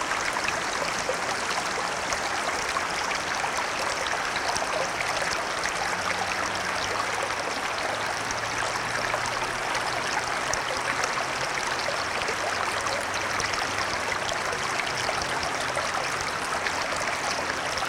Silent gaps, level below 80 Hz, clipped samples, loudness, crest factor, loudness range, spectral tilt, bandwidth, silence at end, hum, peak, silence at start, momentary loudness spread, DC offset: none; -54 dBFS; under 0.1%; -27 LUFS; 20 dB; 1 LU; -1.5 dB/octave; 18 kHz; 0 s; none; -8 dBFS; 0 s; 1 LU; under 0.1%